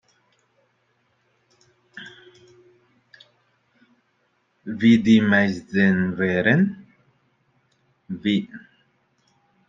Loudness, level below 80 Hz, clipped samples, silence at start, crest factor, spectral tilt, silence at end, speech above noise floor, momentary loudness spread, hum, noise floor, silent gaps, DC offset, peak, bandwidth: -19 LUFS; -62 dBFS; under 0.1%; 1.95 s; 20 dB; -7 dB/octave; 1.1 s; 49 dB; 25 LU; none; -68 dBFS; none; under 0.1%; -4 dBFS; 7.4 kHz